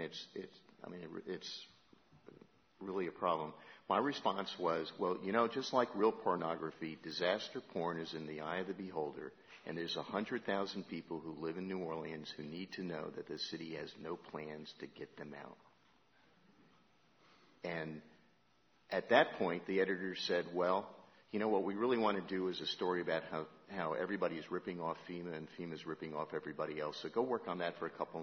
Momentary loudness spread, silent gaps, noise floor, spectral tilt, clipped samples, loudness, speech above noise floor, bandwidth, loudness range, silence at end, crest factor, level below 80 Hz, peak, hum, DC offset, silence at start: 14 LU; none; -74 dBFS; -3 dB/octave; under 0.1%; -40 LUFS; 34 dB; 6.4 kHz; 12 LU; 0 s; 26 dB; -82 dBFS; -14 dBFS; none; under 0.1%; 0 s